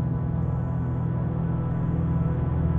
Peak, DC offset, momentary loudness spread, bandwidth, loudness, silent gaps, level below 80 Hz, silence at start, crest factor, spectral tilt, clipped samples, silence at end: -14 dBFS; under 0.1%; 2 LU; 3.5 kHz; -26 LUFS; none; -36 dBFS; 0 s; 12 dB; -12 dB/octave; under 0.1%; 0 s